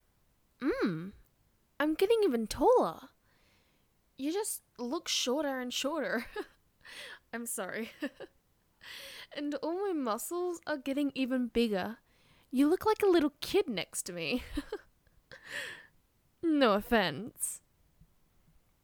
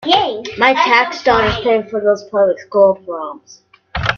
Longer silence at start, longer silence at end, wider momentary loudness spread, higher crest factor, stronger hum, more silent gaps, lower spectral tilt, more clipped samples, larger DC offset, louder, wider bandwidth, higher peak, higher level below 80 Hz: first, 0.6 s vs 0 s; first, 1.25 s vs 0 s; first, 18 LU vs 13 LU; first, 22 dB vs 16 dB; neither; neither; about the same, -3.5 dB/octave vs -4.5 dB/octave; neither; neither; second, -32 LUFS vs -14 LUFS; first, over 20 kHz vs 7 kHz; second, -12 dBFS vs 0 dBFS; second, -60 dBFS vs -40 dBFS